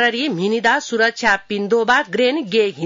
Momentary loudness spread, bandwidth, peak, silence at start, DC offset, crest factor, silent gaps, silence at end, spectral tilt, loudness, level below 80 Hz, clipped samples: 4 LU; 7.6 kHz; -4 dBFS; 0 s; under 0.1%; 14 dB; none; 0 s; -4 dB/octave; -17 LUFS; -54 dBFS; under 0.1%